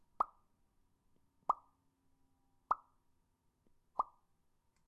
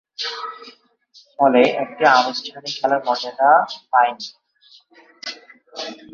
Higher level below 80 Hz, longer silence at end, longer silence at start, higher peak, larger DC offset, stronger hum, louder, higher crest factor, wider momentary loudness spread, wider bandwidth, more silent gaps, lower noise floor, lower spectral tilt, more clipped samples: second, -78 dBFS vs -70 dBFS; first, 0.85 s vs 0.2 s; about the same, 0.2 s vs 0.2 s; second, -20 dBFS vs -2 dBFS; neither; neither; second, -42 LUFS vs -18 LUFS; first, 26 dB vs 18 dB; second, 5 LU vs 18 LU; first, 11 kHz vs 7.4 kHz; neither; first, -78 dBFS vs -53 dBFS; first, -5.5 dB/octave vs -3.5 dB/octave; neither